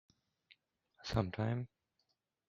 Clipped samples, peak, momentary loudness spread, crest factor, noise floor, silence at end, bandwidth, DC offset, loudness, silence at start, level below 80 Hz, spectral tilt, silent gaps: under 0.1%; -18 dBFS; 13 LU; 26 dB; -84 dBFS; 0.8 s; 7.4 kHz; under 0.1%; -39 LUFS; 0.5 s; -60 dBFS; -7 dB/octave; none